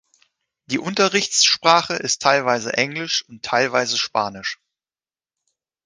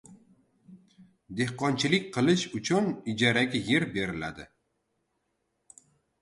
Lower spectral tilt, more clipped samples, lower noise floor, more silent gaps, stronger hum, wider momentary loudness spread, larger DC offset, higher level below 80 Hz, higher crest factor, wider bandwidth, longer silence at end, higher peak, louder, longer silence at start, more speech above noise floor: second, -2 dB/octave vs -5 dB/octave; neither; first, under -90 dBFS vs -78 dBFS; neither; neither; about the same, 11 LU vs 11 LU; neither; about the same, -64 dBFS vs -62 dBFS; about the same, 20 dB vs 22 dB; about the same, 10.5 kHz vs 11.5 kHz; second, 1.3 s vs 1.75 s; first, 0 dBFS vs -8 dBFS; first, -19 LUFS vs -27 LUFS; first, 0.7 s vs 0.1 s; first, over 70 dB vs 50 dB